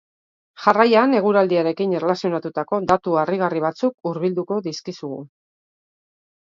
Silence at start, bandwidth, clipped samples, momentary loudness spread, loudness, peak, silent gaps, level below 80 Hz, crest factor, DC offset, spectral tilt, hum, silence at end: 0.6 s; 7.6 kHz; under 0.1%; 14 LU; -20 LUFS; 0 dBFS; 3.94-3.98 s; -62 dBFS; 20 dB; under 0.1%; -6.5 dB/octave; none; 1.25 s